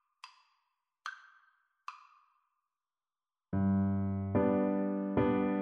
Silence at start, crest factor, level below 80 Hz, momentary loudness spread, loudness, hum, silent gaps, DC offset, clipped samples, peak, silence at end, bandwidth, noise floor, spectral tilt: 0.25 s; 18 dB; -62 dBFS; 20 LU; -32 LUFS; none; none; under 0.1%; under 0.1%; -18 dBFS; 0 s; 6.6 kHz; under -90 dBFS; -9.5 dB/octave